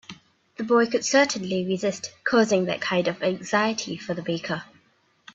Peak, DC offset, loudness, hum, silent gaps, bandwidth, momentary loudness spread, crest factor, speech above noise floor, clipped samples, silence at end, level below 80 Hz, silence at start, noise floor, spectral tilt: -8 dBFS; under 0.1%; -24 LUFS; none; none; 8 kHz; 10 LU; 18 dB; 40 dB; under 0.1%; 0.7 s; -68 dBFS; 0.1 s; -63 dBFS; -4 dB/octave